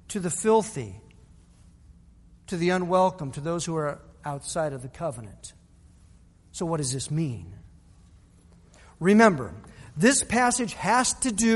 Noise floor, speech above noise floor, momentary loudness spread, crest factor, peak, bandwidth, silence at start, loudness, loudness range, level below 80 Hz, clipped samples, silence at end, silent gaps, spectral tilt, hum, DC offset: -55 dBFS; 30 dB; 20 LU; 22 dB; -4 dBFS; 11.5 kHz; 0.1 s; -25 LUFS; 10 LU; -54 dBFS; under 0.1%; 0 s; none; -4.5 dB/octave; none; under 0.1%